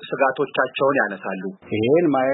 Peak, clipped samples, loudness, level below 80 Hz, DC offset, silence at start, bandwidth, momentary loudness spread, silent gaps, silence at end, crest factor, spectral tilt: -4 dBFS; under 0.1%; -21 LUFS; -64 dBFS; under 0.1%; 0 s; 4.1 kHz; 11 LU; none; 0 s; 16 dB; -11 dB/octave